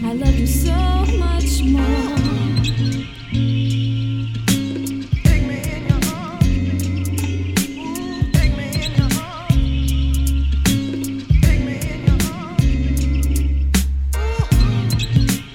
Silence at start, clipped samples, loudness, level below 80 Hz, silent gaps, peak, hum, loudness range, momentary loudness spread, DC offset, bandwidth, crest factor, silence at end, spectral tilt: 0 s; under 0.1%; -19 LUFS; -20 dBFS; none; 0 dBFS; none; 2 LU; 6 LU; under 0.1%; 16.5 kHz; 16 dB; 0 s; -5.5 dB/octave